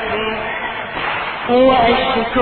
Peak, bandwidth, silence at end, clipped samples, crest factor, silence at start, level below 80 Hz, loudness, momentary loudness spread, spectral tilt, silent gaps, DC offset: 0 dBFS; 4.5 kHz; 0 s; under 0.1%; 16 dB; 0 s; -40 dBFS; -16 LUFS; 10 LU; -8 dB/octave; none; under 0.1%